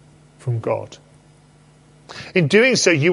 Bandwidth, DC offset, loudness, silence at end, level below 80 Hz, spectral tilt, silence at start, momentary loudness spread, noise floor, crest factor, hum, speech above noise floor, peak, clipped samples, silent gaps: 11.5 kHz; under 0.1%; -17 LUFS; 0 s; -60 dBFS; -4.5 dB/octave; 0.45 s; 23 LU; -50 dBFS; 18 dB; none; 34 dB; -2 dBFS; under 0.1%; none